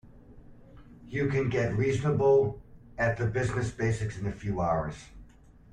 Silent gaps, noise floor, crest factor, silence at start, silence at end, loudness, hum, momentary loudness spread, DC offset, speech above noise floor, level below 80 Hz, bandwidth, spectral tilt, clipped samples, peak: none; -54 dBFS; 16 dB; 0.05 s; 0.45 s; -29 LUFS; none; 13 LU; under 0.1%; 26 dB; -50 dBFS; 10.5 kHz; -7 dB/octave; under 0.1%; -14 dBFS